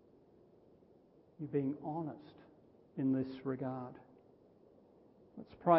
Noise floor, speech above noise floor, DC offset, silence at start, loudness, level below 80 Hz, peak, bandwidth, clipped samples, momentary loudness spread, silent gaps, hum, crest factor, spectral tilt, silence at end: -66 dBFS; 29 dB; under 0.1%; 1.4 s; -40 LUFS; -76 dBFS; -16 dBFS; 5.6 kHz; under 0.1%; 21 LU; none; none; 24 dB; -8 dB/octave; 0 s